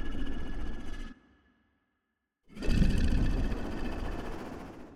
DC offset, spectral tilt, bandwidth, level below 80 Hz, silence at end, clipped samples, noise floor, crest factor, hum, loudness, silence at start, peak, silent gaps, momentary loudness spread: under 0.1%; -7 dB/octave; 11 kHz; -34 dBFS; 0 s; under 0.1%; -83 dBFS; 18 dB; none; -35 LUFS; 0 s; -14 dBFS; none; 16 LU